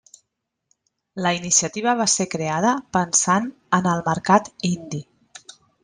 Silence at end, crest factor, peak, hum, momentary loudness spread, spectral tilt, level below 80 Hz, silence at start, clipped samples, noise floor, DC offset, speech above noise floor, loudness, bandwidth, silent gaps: 0.8 s; 20 dB; -2 dBFS; none; 8 LU; -3.5 dB/octave; -60 dBFS; 1.15 s; under 0.1%; -79 dBFS; under 0.1%; 58 dB; -20 LUFS; 10.5 kHz; none